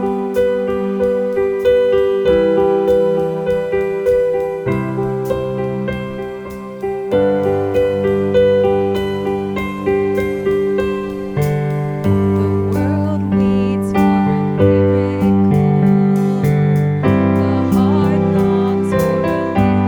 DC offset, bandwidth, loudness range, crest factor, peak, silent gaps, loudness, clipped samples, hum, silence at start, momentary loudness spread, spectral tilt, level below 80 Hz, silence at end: under 0.1%; 19 kHz; 5 LU; 14 dB; -2 dBFS; none; -16 LUFS; under 0.1%; none; 0 s; 7 LU; -8.5 dB/octave; -40 dBFS; 0 s